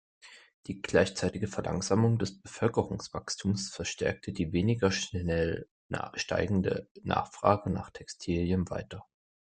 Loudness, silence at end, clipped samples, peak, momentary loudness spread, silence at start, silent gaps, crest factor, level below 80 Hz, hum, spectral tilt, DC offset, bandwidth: -31 LUFS; 0.55 s; under 0.1%; -8 dBFS; 12 LU; 0.25 s; 0.54-0.63 s, 5.71-5.89 s, 6.91-6.95 s; 24 dB; -56 dBFS; none; -5.5 dB/octave; under 0.1%; 9.4 kHz